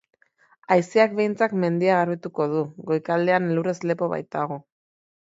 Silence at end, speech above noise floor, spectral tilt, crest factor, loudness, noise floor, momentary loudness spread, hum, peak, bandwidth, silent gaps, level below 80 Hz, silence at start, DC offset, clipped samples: 0.7 s; 39 dB; -7 dB/octave; 20 dB; -23 LUFS; -61 dBFS; 7 LU; none; -4 dBFS; 7.8 kHz; none; -72 dBFS; 0.7 s; under 0.1%; under 0.1%